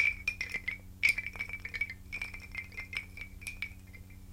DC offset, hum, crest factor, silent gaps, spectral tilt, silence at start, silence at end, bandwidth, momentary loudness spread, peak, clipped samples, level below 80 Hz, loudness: under 0.1%; none; 24 dB; none; -2 dB/octave; 0 s; 0 s; 17 kHz; 15 LU; -14 dBFS; under 0.1%; -52 dBFS; -35 LUFS